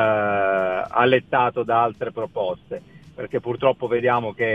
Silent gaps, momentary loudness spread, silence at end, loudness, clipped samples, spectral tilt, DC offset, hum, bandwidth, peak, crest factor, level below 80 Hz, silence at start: none; 11 LU; 0 s; -21 LUFS; under 0.1%; -7.5 dB/octave; under 0.1%; none; 6 kHz; -4 dBFS; 18 dB; -58 dBFS; 0 s